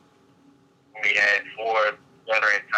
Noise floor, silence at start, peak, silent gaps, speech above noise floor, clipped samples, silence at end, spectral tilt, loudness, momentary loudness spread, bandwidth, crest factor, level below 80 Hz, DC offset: -57 dBFS; 0.95 s; -8 dBFS; none; 34 dB; under 0.1%; 0 s; -1 dB/octave; -22 LUFS; 7 LU; 9.2 kHz; 18 dB; -80 dBFS; under 0.1%